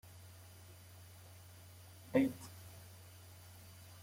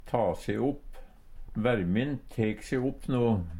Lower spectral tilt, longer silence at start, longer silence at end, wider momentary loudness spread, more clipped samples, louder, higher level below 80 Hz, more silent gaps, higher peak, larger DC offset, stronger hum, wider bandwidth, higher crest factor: second, -6 dB/octave vs -7.5 dB/octave; about the same, 0.05 s vs 0 s; about the same, 0 s vs 0 s; first, 22 LU vs 6 LU; neither; second, -38 LUFS vs -30 LUFS; second, -76 dBFS vs -46 dBFS; neither; second, -18 dBFS vs -12 dBFS; neither; neither; about the same, 16.5 kHz vs 15.5 kHz; first, 26 dB vs 18 dB